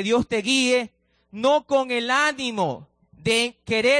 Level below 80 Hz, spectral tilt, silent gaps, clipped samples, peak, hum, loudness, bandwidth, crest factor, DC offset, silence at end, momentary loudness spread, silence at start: -56 dBFS; -3 dB/octave; none; under 0.1%; -8 dBFS; none; -22 LUFS; 10.5 kHz; 14 dB; under 0.1%; 0 s; 10 LU; 0 s